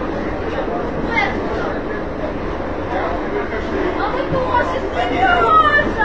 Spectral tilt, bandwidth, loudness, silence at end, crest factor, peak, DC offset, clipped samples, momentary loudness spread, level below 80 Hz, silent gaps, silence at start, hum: -6.5 dB/octave; 8 kHz; -18 LUFS; 0 s; 16 dB; -2 dBFS; 2%; under 0.1%; 12 LU; -32 dBFS; none; 0 s; none